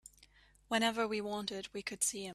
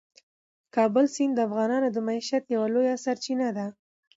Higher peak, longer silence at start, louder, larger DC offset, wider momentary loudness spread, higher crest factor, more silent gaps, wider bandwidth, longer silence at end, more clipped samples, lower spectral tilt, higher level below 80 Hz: second, -16 dBFS vs -12 dBFS; second, 0.2 s vs 0.75 s; second, -36 LUFS vs -26 LUFS; neither; about the same, 9 LU vs 7 LU; first, 22 dB vs 16 dB; neither; first, 15 kHz vs 7.8 kHz; second, 0 s vs 0.45 s; neither; second, -2 dB/octave vs -5 dB/octave; first, -70 dBFS vs -78 dBFS